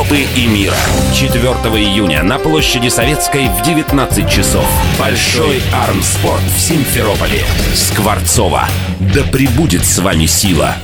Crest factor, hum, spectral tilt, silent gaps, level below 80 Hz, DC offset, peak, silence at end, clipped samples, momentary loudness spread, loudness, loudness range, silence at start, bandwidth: 12 dB; none; -4 dB/octave; none; -22 dBFS; 0.2%; 0 dBFS; 0 s; under 0.1%; 2 LU; -11 LUFS; 1 LU; 0 s; over 20 kHz